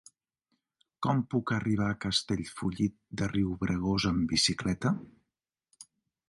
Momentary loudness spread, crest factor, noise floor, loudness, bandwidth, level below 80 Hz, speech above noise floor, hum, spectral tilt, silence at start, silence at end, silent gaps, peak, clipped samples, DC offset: 8 LU; 18 dB; -88 dBFS; -30 LUFS; 11.5 kHz; -52 dBFS; 58 dB; none; -4.5 dB/octave; 1 s; 0.45 s; none; -14 dBFS; under 0.1%; under 0.1%